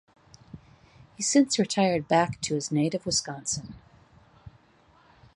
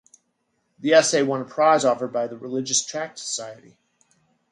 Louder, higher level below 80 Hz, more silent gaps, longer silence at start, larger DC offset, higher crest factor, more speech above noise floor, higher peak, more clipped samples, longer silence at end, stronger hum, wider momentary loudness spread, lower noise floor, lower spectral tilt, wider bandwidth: second, -26 LUFS vs -22 LUFS; first, -60 dBFS vs -74 dBFS; neither; second, 0.55 s vs 0.8 s; neither; about the same, 20 dB vs 20 dB; second, 34 dB vs 50 dB; second, -8 dBFS vs -4 dBFS; neither; second, 0.85 s vs 1 s; neither; second, 9 LU vs 13 LU; second, -60 dBFS vs -72 dBFS; first, -4 dB/octave vs -2.5 dB/octave; about the same, 11.5 kHz vs 11.5 kHz